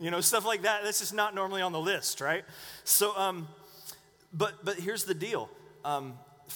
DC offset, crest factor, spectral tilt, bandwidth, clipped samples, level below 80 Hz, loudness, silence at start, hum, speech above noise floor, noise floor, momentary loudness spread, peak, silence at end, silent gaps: under 0.1%; 22 dB; -2 dB/octave; over 20 kHz; under 0.1%; -74 dBFS; -30 LUFS; 0 s; none; 20 dB; -51 dBFS; 20 LU; -10 dBFS; 0 s; none